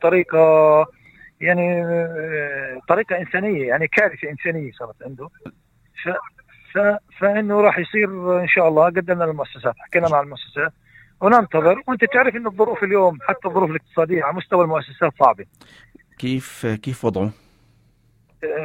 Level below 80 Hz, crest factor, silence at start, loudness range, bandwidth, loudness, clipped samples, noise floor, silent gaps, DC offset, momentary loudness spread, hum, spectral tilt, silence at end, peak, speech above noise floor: -60 dBFS; 20 dB; 0 s; 6 LU; 17 kHz; -19 LUFS; under 0.1%; -58 dBFS; none; under 0.1%; 12 LU; none; -7 dB/octave; 0 s; 0 dBFS; 39 dB